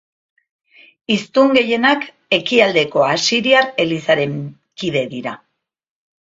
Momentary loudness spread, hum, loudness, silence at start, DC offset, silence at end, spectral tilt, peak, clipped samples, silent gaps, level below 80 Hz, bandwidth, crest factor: 15 LU; none; -16 LUFS; 1.1 s; under 0.1%; 1.05 s; -4 dB/octave; 0 dBFS; under 0.1%; none; -60 dBFS; 7.8 kHz; 18 dB